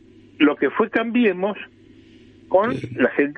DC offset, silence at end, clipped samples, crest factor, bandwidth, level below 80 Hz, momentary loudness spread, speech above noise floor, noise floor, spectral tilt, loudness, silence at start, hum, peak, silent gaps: under 0.1%; 0.05 s; under 0.1%; 18 dB; 6.2 kHz; -60 dBFS; 8 LU; 28 dB; -48 dBFS; -7.5 dB/octave; -20 LUFS; 0.4 s; 50 Hz at -60 dBFS; -4 dBFS; none